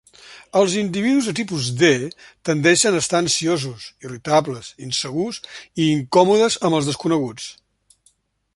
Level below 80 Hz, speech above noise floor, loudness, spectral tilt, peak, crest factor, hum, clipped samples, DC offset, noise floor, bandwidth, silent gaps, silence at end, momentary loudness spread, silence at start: -58 dBFS; 42 dB; -19 LUFS; -4 dB/octave; -2 dBFS; 18 dB; none; under 0.1%; under 0.1%; -62 dBFS; 11.5 kHz; none; 1.05 s; 16 LU; 0.25 s